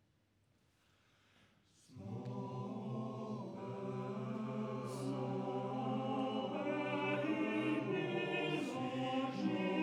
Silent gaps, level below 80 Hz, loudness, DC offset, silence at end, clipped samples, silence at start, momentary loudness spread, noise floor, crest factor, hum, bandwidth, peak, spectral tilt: none; -86 dBFS; -40 LUFS; under 0.1%; 0 s; under 0.1%; 1.9 s; 8 LU; -76 dBFS; 16 dB; none; 12.5 kHz; -26 dBFS; -7 dB/octave